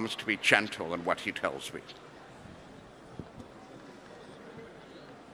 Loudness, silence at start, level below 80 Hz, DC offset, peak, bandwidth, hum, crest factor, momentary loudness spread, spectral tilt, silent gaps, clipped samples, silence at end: -30 LUFS; 0 s; -66 dBFS; under 0.1%; -4 dBFS; over 20 kHz; none; 32 dB; 24 LU; -3 dB/octave; none; under 0.1%; 0 s